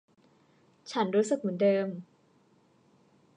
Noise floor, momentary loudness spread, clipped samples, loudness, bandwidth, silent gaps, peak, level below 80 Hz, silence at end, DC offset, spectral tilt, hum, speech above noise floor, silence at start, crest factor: -65 dBFS; 15 LU; under 0.1%; -29 LUFS; 10.5 kHz; none; -14 dBFS; -86 dBFS; 1.35 s; under 0.1%; -6 dB/octave; none; 37 dB; 0.85 s; 18 dB